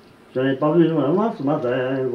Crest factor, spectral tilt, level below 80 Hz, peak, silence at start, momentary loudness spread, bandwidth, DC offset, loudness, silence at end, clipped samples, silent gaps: 16 dB; -9 dB/octave; -64 dBFS; -4 dBFS; 0.35 s; 6 LU; 6 kHz; under 0.1%; -20 LUFS; 0 s; under 0.1%; none